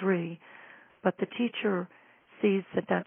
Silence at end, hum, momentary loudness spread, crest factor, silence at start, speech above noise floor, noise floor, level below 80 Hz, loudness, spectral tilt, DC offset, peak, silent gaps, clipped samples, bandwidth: 0.05 s; none; 17 LU; 22 dB; 0 s; 24 dB; -53 dBFS; -80 dBFS; -31 LUFS; -4 dB/octave; under 0.1%; -10 dBFS; none; under 0.1%; 3.7 kHz